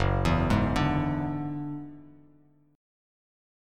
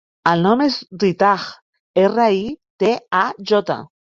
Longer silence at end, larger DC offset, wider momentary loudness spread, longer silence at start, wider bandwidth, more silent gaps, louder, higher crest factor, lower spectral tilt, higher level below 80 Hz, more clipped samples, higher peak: first, 1.7 s vs 0.3 s; neither; first, 13 LU vs 9 LU; second, 0 s vs 0.25 s; first, 12.5 kHz vs 7.6 kHz; second, none vs 1.62-1.73 s, 1.80-1.94 s, 2.70-2.79 s; second, -28 LUFS vs -18 LUFS; about the same, 18 dB vs 16 dB; about the same, -7 dB/octave vs -6 dB/octave; first, -40 dBFS vs -60 dBFS; neither; second, -12 dBFS vs -2 dBFS